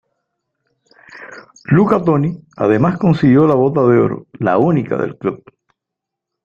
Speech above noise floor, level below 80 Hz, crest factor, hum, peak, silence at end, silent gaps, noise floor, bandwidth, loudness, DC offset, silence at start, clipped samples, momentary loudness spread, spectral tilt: 68 dB; -50 dBFS; 16 dB; none; 0 dBFS; 1.1 s; none; -81 dBFS; 7.2 kHz; -14 LUFS; under 0.1%; 1.15 s; under 0.1%; 19 LU; -9.5 dB/octave